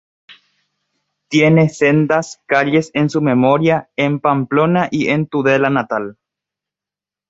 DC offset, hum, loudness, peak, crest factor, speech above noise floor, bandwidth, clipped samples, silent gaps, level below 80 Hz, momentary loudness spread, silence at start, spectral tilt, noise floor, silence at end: under 0.1%; none; -15 LUFS; -2 dBFS; 14 dB; 74 dB; 8 kHz; under 0.1%; none; -58 dBFS; 6 LU; 0.3 s; -6.5 dB/octave; -88 dBFS; 1.15 s